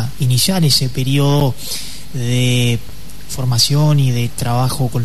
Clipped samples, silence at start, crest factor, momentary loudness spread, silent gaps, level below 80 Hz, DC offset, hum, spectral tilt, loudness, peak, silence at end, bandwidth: under 0.1%; 0 s; 14 dB; 12 LU; none; -38 dBFS; 7%; none; -5 dB/octave; -15 LUFS; -2 dBFS; 0 s; 13.5 kHz